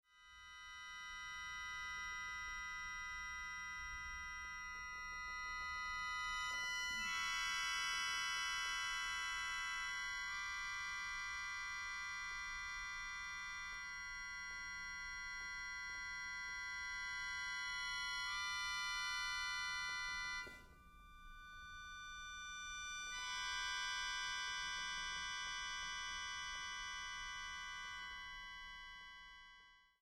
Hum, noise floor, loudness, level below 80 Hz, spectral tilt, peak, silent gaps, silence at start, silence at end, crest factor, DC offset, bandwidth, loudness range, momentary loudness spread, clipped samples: none; -66 dBFS; -44 LUFS; -64 dBFS; 1 dB/octave; -30 dBFS; none; 0.1 s; 0.15 s; 16 dB; under 0.1%; 15.5 kHz; 7 LU; 12 LU; under 0.1%